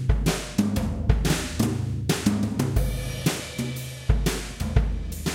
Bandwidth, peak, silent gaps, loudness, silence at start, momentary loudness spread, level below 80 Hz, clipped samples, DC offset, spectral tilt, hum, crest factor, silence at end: 17 kHz; -6 dBFS; none; -26 LUFS; 0 s; 6 LU; -30 dBFS; under 0.1%; under 0.1%; -5.5 dB/octave; none; 20 dB; 0 s